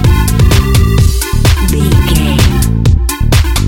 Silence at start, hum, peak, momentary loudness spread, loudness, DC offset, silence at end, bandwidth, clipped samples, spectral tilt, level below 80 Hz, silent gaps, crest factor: 0 s; none; 0 dBFS; 2 LU; -10 LUFS; under 0.1%; 0 s; 17.5 kHz; 0.3%; -5.5 dB/octave; -12 dBFS; none; 8 dB